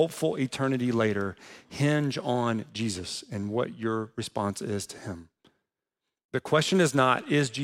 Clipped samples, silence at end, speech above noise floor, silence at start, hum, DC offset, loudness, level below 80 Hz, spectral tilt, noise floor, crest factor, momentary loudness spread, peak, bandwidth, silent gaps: under 0.1%; 0 s; 59 dB; 0 s; none; under 0.1%; -28 LUFS; -66 dBFS; -5 dB/octave; -87 dBFS; 20 dB; 12 LU; -8 dBFS; 16.5 kHz; 6.25-6.29 s